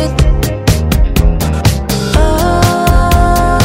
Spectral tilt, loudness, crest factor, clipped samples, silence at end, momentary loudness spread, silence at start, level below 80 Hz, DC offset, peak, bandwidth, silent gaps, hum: -5.5 dB/octave; -11 LUFS; 10 dB; 0.3%; 0 s; 3 LU; 0 s; -12 dBFS; under 0.1%; 0 dBFS; 16.5 kHz; none; none